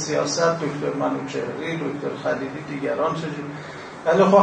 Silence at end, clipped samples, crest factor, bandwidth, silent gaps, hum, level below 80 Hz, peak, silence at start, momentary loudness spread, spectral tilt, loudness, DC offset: 0 s; under 0.1%; 20 dB; 9.6 kHz; none; none; -62 dBFS; -2 dBFS; 0 s; 10 LU; -5 dB/octave; -24 LUFS; under 0.1%